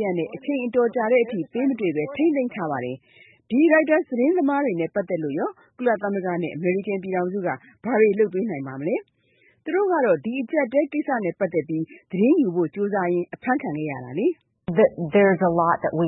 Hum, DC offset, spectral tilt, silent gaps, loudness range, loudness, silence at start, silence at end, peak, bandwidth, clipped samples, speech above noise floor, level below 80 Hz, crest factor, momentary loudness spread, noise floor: none; under 0.1%; -12 dB/octave; none; 2 LU; -23 LUFS; 0 s; 0 s; -6 dBFS; 4 kHz; under 0.1%; 39 dB; -66 dBFS; 16 dB; 10 LU; -61 dBFS